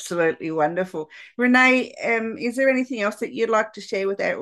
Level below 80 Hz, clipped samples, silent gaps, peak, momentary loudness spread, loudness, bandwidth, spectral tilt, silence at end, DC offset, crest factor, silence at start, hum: -72 dBFS; under 0.1%; none; -4 dBFS; 11 LU; -21 LUFS; 12.5 kHz; -4.5 dB/octave; 0 s; under 0.1%; 18 dB; 0 s; none